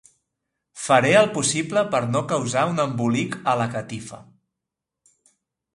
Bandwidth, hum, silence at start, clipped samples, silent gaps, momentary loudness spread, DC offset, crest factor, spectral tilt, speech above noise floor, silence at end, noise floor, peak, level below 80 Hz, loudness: 11.5 kHz; none; 0.75 s; under 0.1%; none; 15 LU; under 0.1%; 20 dB; -4.5 dB/octave; 64 dB; 1.55 s; -85 dBFS; -2 dBFS; -62 dBFS; -21 LUFS